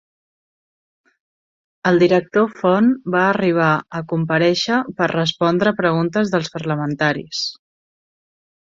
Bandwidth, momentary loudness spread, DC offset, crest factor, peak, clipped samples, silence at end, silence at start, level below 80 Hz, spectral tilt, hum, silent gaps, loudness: 7.6 kHz; 7 LU; under 0.1%; 18 dB; -2 dBFS; under 0.1%; 1.15 s; 1.85 s; -60 dBFS; -6 dB/octave; none; none; -18 LUFS